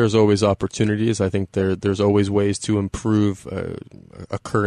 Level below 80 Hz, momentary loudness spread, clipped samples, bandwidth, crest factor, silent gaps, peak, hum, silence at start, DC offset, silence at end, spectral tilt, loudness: -46 dBFS; 14 LU; under 0.1%; 11 kHz; 14 dB; none; -6 dBFS; none; 0 s; under 0.1%; 0 s; -6.5 dB/octave; -20 LUFS